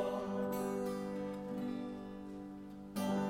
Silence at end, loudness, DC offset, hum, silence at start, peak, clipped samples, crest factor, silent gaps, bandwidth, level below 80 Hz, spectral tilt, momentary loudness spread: 0 s; -41 LUFS; under 0.1%; none; 0 s; -24 dBFS; under 0.1%; 16 dB; none; 16.5 kHz; -66 dBFS; -6.5 dB/octave; 10 LU